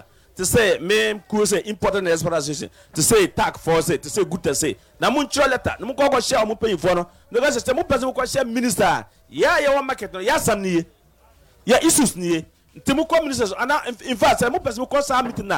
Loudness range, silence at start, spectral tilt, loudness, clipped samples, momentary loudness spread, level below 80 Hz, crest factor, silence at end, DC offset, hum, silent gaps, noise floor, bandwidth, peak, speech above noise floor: 1 LU; 0.35 s; -3.5 dB/octave; -20 LUFS; under 0.1%; 8 LU; -44 dBFS; 12 dB; 0 s; under 0.1%; none; none; -54 dBFS; 17.5 kHz; -8 dBFS; 34 dB